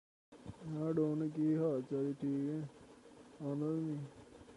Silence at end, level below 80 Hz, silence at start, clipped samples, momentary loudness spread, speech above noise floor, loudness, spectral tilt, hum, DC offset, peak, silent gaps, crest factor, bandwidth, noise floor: 0 s; -74 dBFS; 0.3 s; under 0.1%; 21 LU; 22 dB; -38 LUFS; -9.5 dB/octave; none; under 0.1%; -24 dBFS; none; 14 dB; 11 kHz; -59 dBFS